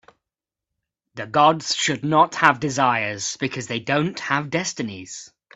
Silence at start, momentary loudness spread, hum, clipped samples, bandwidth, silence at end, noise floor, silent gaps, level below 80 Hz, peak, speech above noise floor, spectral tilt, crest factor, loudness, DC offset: 1.15 s; 16 LU; none; under 0.1%; 8.4 kHz; 0.3 s; -87 dBFS; none; -62 dBFS; 0 dBFS; 66 dB; -3.5 dB/octave; 22 dB; -21 LUFS; under 0.1%